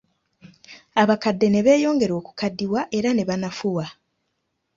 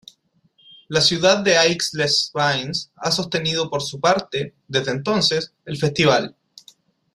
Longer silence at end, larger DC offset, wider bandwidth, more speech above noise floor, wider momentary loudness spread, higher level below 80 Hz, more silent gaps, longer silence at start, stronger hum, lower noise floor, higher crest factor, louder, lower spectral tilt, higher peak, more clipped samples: about the same, 0.85 s vs 0.85 s; neither; second, 7.6 kHz vs 15 kHz; first, 54 dB vs 41 dB; about the same, 9 LU vs 10 LU; about the same, -60 dBFS vs -58 dBFS; neither; second, 0.45 s vs 0.9 s; neither; first, -75 dBFS vs -61 dBFS; about the same, 20 dB vs 20 dB; about the same, -21 LUFS vs -19 LUFS; first, -6 dB/octave vs -3.5 dB/octave; about the same, -2 dBFS vs -2 dBFS; neither